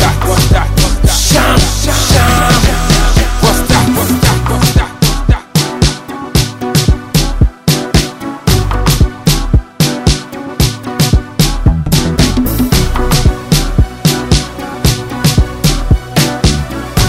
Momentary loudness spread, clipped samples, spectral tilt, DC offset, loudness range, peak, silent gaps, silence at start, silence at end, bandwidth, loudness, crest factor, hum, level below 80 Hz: 5 LU; 0.2%; -4.5 dB/octave; under 0.1%; 3 LU; 0 dBFS; none; 0 s; 0 s; 16.5 kHz; -11 LUFS; 10 dB; none; -16 dBFS